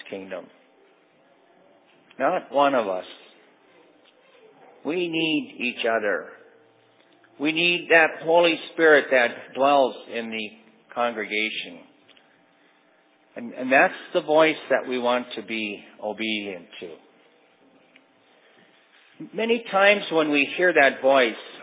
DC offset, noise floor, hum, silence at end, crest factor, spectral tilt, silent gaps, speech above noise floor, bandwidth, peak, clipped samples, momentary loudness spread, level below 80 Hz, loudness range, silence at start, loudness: under 0.1%; -60 dBFS; none; 0 s; 22 dB; -7.5 dB/octave; none; 38 dB; 4 kHz; -4 dBFS; under 0.1%; 19 LU; -84 dBFS; 11 LU; 0.05 s; -22 LUFS